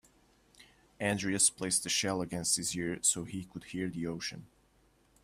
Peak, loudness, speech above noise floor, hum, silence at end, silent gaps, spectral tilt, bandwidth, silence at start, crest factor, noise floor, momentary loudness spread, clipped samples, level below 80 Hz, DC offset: -14 dBFS; -32 LUFS; 34 dB; none; 0.8 s; none; -2.5 dB/octave; 15.5 kHz; 0.6 s; 22 dB; -68 dBFS; 14 LU; under 0.1%; -66 dBFS; under 0.1%